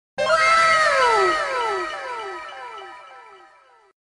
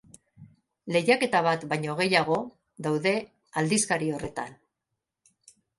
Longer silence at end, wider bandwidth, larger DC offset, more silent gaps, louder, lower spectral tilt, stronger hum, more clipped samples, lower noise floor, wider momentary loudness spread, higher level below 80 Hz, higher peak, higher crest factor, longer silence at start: second, 0.75 s vs 1.25 s; about the same, 10.5 kHz vs 11.5 kHz; neither; neither; first, -18 LUFS vs -26 LUFS; second, -1.5 dB/octave vs -4 dB/octave; neither; neither; second, -53 dBFS vs -84 dBFS; first, 21 LU vs 13 LU; first, -56 dBFS vs -66 dBFS; about the same, -4 dBFS vs -6 dBFS; about the same, 18 dB vs 22 dB; second, 0.15 s vs 0.4 s